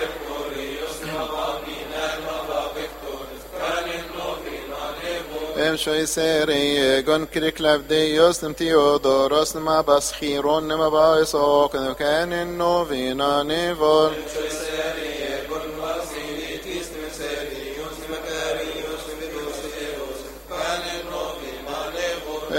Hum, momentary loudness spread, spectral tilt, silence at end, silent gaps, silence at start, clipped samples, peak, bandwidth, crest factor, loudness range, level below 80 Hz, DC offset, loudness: none; 13 LU; -3.5 dB/octave; 0 s; none; 0 s; under 0.1%; -2 dBFS; 16.5 kHz; 20 dB; 10 LU; -46 dBFS; under 0.1%; -23 LUFS